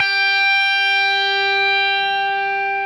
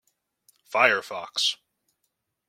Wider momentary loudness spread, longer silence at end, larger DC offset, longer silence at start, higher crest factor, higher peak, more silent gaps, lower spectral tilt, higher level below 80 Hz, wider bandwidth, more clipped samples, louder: second, 5 LU vs 11 LU; second, 0 s vs 0.95 s; neither; second, 0 s vs 0.7 s; second, 12 dB vs 24 dB; about the same, -6 dBFS vs -4 dBFS; neither; about the same, -0.5 dB/octave vs -0.5 dB/octave; first, -74 dBFS vs -80 dBFS; second, 12.5 kHz vs 16.5 kHz; neither; first, -15 LUFS vs -24 LUFS